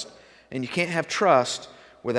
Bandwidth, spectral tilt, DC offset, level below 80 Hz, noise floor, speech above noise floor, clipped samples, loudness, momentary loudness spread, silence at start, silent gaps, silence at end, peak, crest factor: 11 kHz; -4 dB/octave; under 0.1%; -68 dBFS; -45 dBFS; 22 dB; under 0.1%; -24 LUFS; 16 LU; 0 s; none; 0 s; -4 dBFS; 20 dB